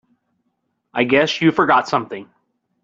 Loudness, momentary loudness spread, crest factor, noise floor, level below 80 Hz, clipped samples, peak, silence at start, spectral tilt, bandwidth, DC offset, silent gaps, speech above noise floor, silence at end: -17 LUFS; 16 LU; 18 dB; -71 dBFS; -60 dBFS; under 0.1%; -2 dBFS; 0.95 s; -5.5 dB/octave; 7.6 kHz; under 0.1%; none; 55 dB; 0.6 s